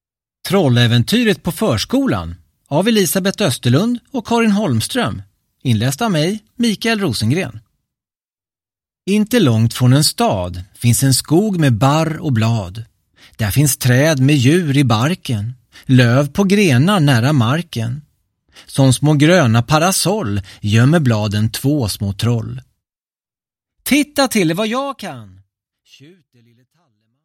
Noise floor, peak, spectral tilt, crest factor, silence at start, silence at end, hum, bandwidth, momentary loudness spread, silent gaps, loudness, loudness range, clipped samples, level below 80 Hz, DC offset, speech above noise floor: under -90 dBFS; 0 dBFS; -5.5 dB/octave; 16 dB; 0.45 s; 2 s; none; 16.5 kHz; 11 LU; none; -15 LUFS; 6 LU; under 0.1%; -46 dBFS; under 0.1%; over 75 dB